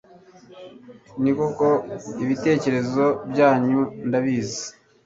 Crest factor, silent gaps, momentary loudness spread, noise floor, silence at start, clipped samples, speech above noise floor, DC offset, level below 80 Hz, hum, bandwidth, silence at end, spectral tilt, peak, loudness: 20 dB; none; 12 LU; -49 dBFS; 0.5 s; under 0.1%; 27 dB; under 0.1%; -60 dBFS; none; 7.8 kHz; 0.35 s; -6 dB/octave; -4 dBFS; -22 LUFS